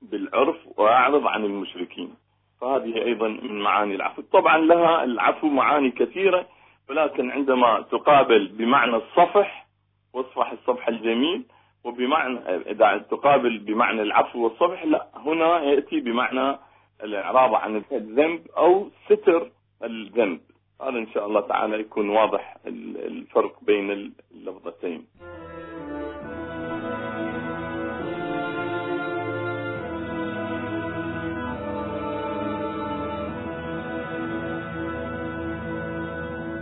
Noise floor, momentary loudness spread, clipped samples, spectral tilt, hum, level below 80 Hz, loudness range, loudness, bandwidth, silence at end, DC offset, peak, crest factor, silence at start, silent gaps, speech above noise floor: -67 dBFS; 15 LU; under 0.1%; -9.5 dB/octave; none; -56 dBFS; 10 LU; -23 LUFS; 4.1 kHz; 0 s; under 0.1%; -4 dBFS; 20 dB; 0 s; none; 45 dB